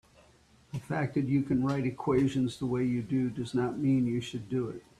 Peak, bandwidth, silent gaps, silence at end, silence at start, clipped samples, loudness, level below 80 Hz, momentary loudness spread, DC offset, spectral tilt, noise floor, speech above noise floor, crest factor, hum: -14 dBFS; 11 kHz; none; 0.2 s; 0.75 s; under 0.1%; -30 LUFS; -60 dBFS; 7 LU; under 0.1%; -7.5 dB/octave; -61 dBFS; 32 dB; 16 dB; none